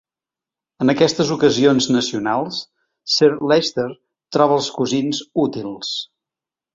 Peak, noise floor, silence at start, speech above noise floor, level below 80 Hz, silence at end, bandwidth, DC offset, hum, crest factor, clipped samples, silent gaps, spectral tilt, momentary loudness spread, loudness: -2 dBFS; -89 dBFS; 0.8 s; 71 dB; -58 dBFS; 0.7 s; 7.8 kHz; under 0.1%; none; 18 dB; under 0.1%; none; -4.5 dB/octave; 12 LU; -18 LUFS